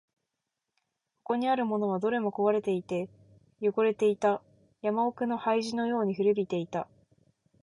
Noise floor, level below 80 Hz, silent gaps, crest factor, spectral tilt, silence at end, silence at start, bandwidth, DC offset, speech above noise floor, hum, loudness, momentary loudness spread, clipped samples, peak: -86 dBFS; -74 dBFS; none; 16 dB; -6.5 dB/octave; 0.8 s; 1.3 s; 11 kHz; under 0.1%; 57 dB; none; -29 LUFS; 9 LU; under 0.1%; -14 dBFS